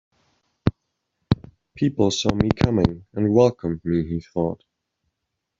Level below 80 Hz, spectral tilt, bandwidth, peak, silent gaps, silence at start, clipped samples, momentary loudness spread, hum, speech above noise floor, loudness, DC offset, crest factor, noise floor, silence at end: -42 dBFS; -6.5 dB/octave; 7.8 kHz; 0 dBFS; none; 0.65 s; under 0.1%; 9 LU; none; 59 dB; -22 LUFS; under 0.1%; 22 dB; -80 dBFS; 1.05 s